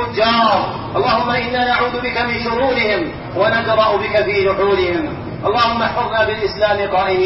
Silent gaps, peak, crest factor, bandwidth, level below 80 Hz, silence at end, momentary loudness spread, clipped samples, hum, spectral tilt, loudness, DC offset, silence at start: none; -2 dBFS; 14 dB; 6.2 kHz; -40 dBFS; 0 s; 5 LU; under 0.1%; none; -2.5 dB/octave; -16 LUFS; under 0.1%; 0 s